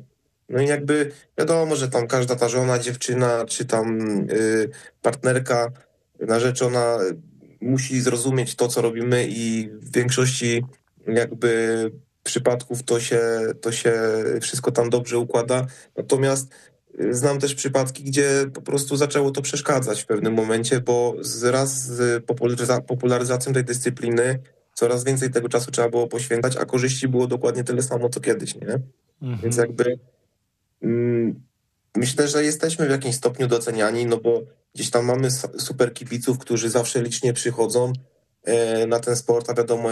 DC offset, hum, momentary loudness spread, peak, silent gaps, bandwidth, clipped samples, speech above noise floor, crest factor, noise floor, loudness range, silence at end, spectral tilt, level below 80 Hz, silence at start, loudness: under 0.1%; none; 7 LU; -6 dBFS; none; 12.5 kHz; under 0.1%; 51 dB; 16 dB; -72 dBFS; 2 LU; 0 s; -4.5 dB/octave; -64 dBFS; 0 s; -22 LUFS